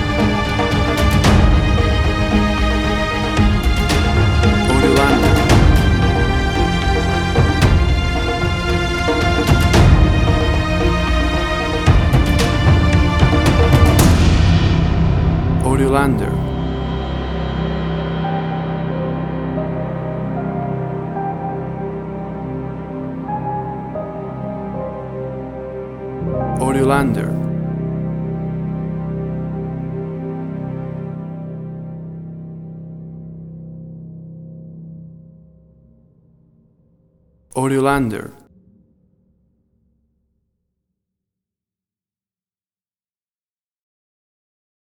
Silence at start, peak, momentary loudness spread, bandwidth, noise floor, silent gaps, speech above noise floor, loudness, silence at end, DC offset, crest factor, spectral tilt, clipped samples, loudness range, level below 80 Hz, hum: 0 s; 0 dBFS; 17 LU; 16 kHz; under -90 dBFS; none; over 73 dB; -17 LUFS; 6.65 s; under 0.1%; 18 dB; -6 dB/octave; under 0.1%; 15 LU; -22 dBFS; none